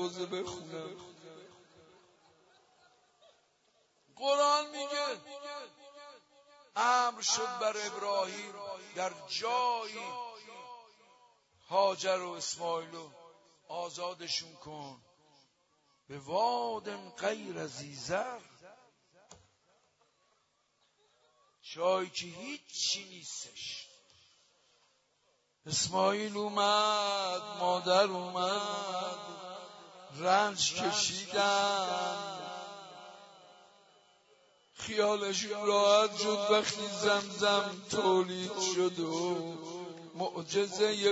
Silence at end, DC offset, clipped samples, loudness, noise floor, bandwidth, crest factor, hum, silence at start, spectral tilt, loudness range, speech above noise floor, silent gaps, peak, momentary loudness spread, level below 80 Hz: 0 s; under 0.1%; under 0.1%; -32 LUFS; -75 dBFS; 8 kHz; 22 dB; none; 0 s; -2.5 dB/octave; 11 LU; 42 dB; none; -12 dBFS; 19 LU; -78 dBFS